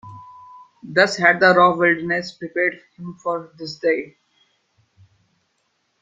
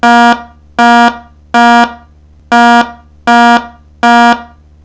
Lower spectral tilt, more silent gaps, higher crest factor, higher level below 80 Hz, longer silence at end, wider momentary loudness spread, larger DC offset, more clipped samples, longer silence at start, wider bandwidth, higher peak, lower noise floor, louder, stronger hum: first, -5 dB/octave vs -3.5 dB/octave; neither; first, 20 dB vs 8 dB; second, -66 dBFS vs -42 dBFS; first, 1.9 s vs 0.4 s; first, 21 LU vs 10 LU; second, under 0.1% vs 0.2%; second, under 0.1% vs 6%; about the same, 0.05 s vs 0.05 s; first, 9 kHz vs 8 kHz; about the same, 0 dBFS vs 0 dBFS; first, -69 dBFS vs -39 dBFS; second, -18 LUFS vs -8 LUFS; neither